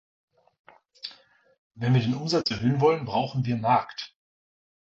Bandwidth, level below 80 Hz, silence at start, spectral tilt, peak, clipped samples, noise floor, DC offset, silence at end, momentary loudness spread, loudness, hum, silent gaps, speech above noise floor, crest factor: 7.8 kHz; -60 dBFS; 1.05 s; -7 dB/octave; -8 dBFS; under 0.1%; -56 dBFS; under 0.1%; 0.75 s; 17 LU; -25 LUFS; none; 1.58-1.71 s; 32 dB; 20 dB